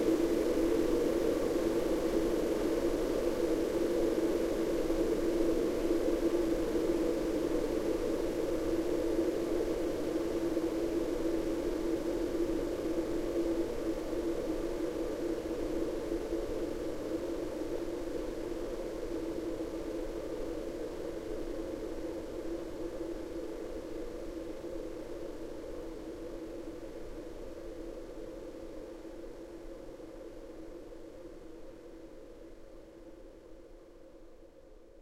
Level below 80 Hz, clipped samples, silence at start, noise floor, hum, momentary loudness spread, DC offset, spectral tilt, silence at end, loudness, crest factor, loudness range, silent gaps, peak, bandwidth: -46 dBFS; under 0.1%; 0 s; -55 dBFS; none; 17 LU; under 0.1%; -6 dB/octave; 0 s; -35 LUFS; 18 dB; 16 LU; none; -16 dBFS; 16 kHz